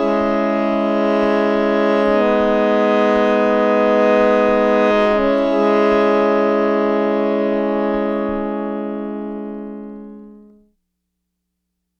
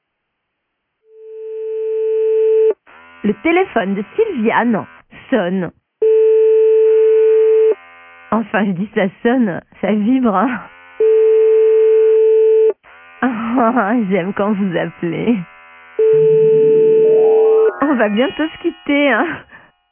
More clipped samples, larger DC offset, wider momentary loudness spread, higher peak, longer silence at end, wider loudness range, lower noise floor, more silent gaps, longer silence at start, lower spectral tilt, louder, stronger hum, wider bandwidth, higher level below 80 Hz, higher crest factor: neither; neither; about the same, 11 LU vs 11 LU; about the same, -2 dBFS vs 0 dBFS; first, 1.65 s vs 0.5 s; first, 11 LU vs 5 LU; about the same, -75 dBFS vs -73 dBFS; neither; second, 0 s vs 1.2 s; second, -7 dB/octave vs -11 dB/octave; about the same, -16 LUFS vs -14 LUFS; neither; first, 7 kHz vs 3.4 kHz; first, -44 dBFS vs -58 dBFS; about the same, 16 dB vs 14 dB